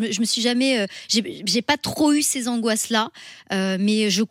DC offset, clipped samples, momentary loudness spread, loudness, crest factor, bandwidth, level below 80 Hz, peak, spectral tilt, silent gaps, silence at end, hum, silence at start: under 0.1%; under 0.1%; 5 LU; -21 LUFS; 16 dB; 16 kHz; -62 dBFS; -6 dBFS; -3 dB/octave; none; 0.05 s; none; 0 s